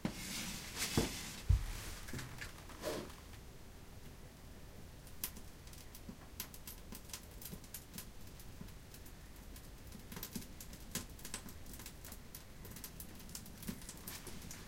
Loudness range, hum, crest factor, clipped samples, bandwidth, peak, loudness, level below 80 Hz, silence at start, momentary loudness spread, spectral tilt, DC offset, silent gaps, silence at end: 10 LU; none; 26 dB; under 0.1%; 17 kHz; -20 dBFS; -46 LUFS; -50 dBFS; 0 s; 17 LU; -4 dB/octave; under 0.1%; none; 0 s